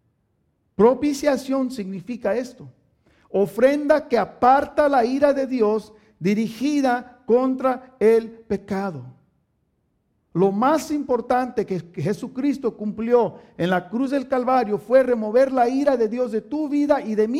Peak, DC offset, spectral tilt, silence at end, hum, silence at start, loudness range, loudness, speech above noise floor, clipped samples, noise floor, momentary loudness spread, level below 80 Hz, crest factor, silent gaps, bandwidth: -4 dBFS; under 0.1%; -6.5 dB/octave; 0 s; none; 0.8 s; 4 LU; -21 LUFS; 49 dB; under 0.1%; -69 dBFS; 9 LU; -58 dBFS; 18 dB; none; 15.5 kHz